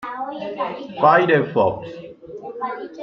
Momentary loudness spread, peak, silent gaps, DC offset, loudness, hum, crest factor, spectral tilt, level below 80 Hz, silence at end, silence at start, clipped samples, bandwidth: 21 LU; -2 dBFS; none; under 0.1%; -20 LUFS; none; 18 dB; -8 dB/octave; -60 dBFS; 0 s; 0 s; under 0.1%; 6.6 kHz